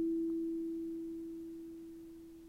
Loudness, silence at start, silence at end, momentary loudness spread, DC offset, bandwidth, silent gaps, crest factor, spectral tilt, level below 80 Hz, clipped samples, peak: -41 LUFS; 0 s; 0 s; 15 LU; under 0.1%; 6.2 kHz; none; 10 dB; -7.5 dB/octave; -68 dBFS; under 0.1%; -30 dBFS